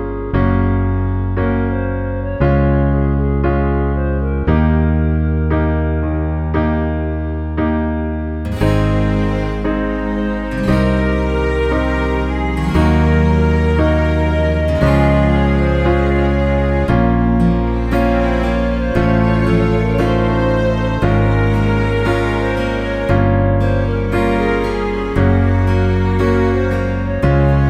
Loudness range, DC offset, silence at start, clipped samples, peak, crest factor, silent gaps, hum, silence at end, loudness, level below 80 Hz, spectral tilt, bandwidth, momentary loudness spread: 4 LU; under 0.1%; 0 s; under 0.1%; 0 dBFS; 14 dB; none; none; 0 s; -16 LUFS; -20 dBFS; -8.5 dB/octave; 9.4 kHz; 5 LU